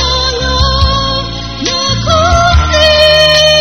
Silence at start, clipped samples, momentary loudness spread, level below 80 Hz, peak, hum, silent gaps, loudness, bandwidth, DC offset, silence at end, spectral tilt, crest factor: 0 s; 0.8%; 9 LU; -18 dBFS; 0 dBFS; none; none; -8 LUFS; 15.5 kHz; 1%; 0 s; -3.5 dB/octave; 10 dB